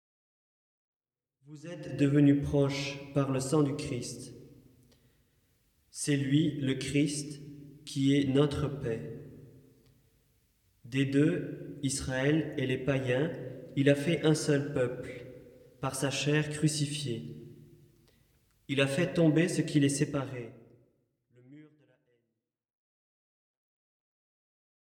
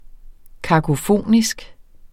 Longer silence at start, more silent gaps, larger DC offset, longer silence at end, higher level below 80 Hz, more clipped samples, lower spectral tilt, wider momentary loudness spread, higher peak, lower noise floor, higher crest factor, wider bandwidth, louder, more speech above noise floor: first, 1.5 s vs 0.25 s; neither; neither; first, 3.35 s vs 0.4 s; second, -60 dBFS vs -40 dBFS; neither; about the same, -5.5 dB/octave vs -5.5 dB/octave; first, 18 LU vs 14 LU; second, -12 dBFS vs -2 dBFS; first, -85 dBFS vs -39 dBFS; about the same, 20 dB vs 18 dB; second, 13.5 kHz vs 16.5 kHz; second, -30 LUFS vs -18 LUFS; first, 56 dB vs 22 dB